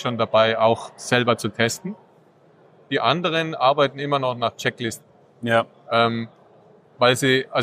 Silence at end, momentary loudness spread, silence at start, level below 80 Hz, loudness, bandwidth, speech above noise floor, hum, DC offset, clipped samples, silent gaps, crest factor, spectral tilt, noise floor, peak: 0 s; 12 LU; 0 s; -68 dBFS; -21 LUFS; 15.5 kHz; 34 dB; none; under 0.1%; under 0.1%; none; 20 dB; -4.5 dB/octave; -54 dBFS; -2 dBFS